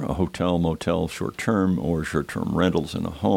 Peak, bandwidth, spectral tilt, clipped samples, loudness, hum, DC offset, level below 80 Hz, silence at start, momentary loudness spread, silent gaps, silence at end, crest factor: -6 dBFS; 16 kHz; -6.5 dB/octave; under 0.1%; -24 LUFS; none; under 0.1%; -42 dBFS; 0 s; 5 LU; none; 0 s; 16 dB